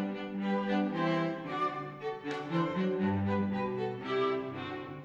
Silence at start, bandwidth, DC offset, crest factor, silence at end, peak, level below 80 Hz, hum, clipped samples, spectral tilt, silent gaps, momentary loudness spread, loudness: 0 s; 7.4 kHz; under 0.1%; 14 dB; 0 s; -18 dBFS; -70 dBFS; none; under 0.1%; -8 dB/octave; none; 8 LU; -33 LUFS